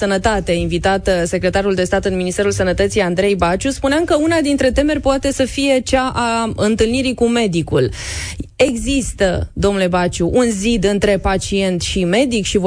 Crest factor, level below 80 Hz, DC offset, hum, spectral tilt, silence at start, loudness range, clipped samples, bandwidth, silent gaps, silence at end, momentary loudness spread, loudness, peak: 14 dB; -30 dBFS; under 0.1%; none; -5 dB/octave; 0 s; 1 LU; under 0.1%; 10.5 kHz; none; 0 s; 3 LU; -16 LUFS; -2 dBFS